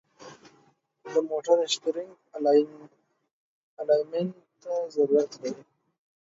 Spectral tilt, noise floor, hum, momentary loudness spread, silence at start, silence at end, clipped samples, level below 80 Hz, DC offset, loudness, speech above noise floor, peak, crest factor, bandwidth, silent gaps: -4.5 dB/octave; -65 dBFS; none; 14 LU; 0.2 s; 0.65 s; under 0.1%; -82 dBFS; under 0.1%; -27 LUFS; 39 dB; -10 dBFS; 20 dB; 7.8 kHz; 3.31-3.77 s